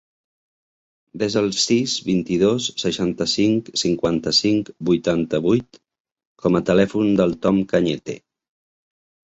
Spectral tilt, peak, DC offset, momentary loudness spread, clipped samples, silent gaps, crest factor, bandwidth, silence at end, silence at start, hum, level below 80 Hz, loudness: -5 dB/octave; -2 dBFS; under 0.1%; 5 LU; under 0.1%; 6.00-6.05 s, 6.27-6.35 s; 18 dB; 8.2 kHz; 1.1 s; 1.15 s; none; -52 dBFS; -20 LUFS